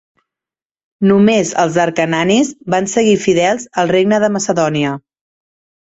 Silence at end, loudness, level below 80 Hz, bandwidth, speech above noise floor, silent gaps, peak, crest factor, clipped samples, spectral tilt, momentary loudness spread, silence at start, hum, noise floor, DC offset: 0.95 s; -14 LUFS; -54 dBFS; 8 kHz; 77 dB; none; -2 dBFS; 14 dB; under 0.1%; -5 dB/octave; 6 LU; 1 s; none; -90 dBFS; under 0.1%